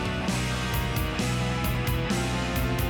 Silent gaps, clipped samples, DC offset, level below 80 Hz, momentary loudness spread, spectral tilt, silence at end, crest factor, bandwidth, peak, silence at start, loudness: none; under 0.1%; under 0.1%; -34 dBFS; 1 LU; -5 dB/octave; 0 s; 10 dB; 19.5 kHz; -16 dBFS; 0 s; -27 LUFS